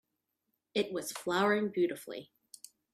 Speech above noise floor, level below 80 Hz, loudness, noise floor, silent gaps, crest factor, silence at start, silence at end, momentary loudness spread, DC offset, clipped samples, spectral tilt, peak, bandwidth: 52 dB; -80 dBFS; -33 LUFS; -84 dBFS; none; 18 dB; 0.75 s; 0.7 s; 23 LU; under 0.1%; under 0.1%; -4 dB/octave; -16 dBFS; 15 kHz